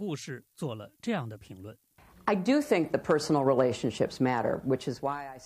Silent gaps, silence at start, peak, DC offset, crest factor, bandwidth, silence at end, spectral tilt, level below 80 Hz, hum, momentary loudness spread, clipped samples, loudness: none; 0 s; -10 dBFS; under 0.1%; 18 dB; 15.5 kHz; 0 s; -6 dB/octave; -64 dBFS; none; 16 LU; under 0.1%; -29 LUFS